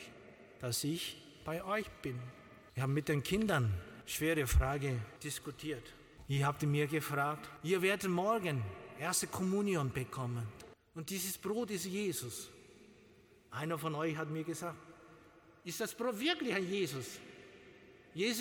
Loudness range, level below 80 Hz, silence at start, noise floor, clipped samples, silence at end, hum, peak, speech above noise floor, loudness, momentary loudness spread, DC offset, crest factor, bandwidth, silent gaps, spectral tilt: 6 LU; -50 dBFS; 0 s; -63 dBFS; under 0.1%; 0 s; none; -20 dBFS; 27 dB; -37 LUFS; 17 LU; under 0.1%; 18 dB; 19 kHz; none; -4.5 dB/octave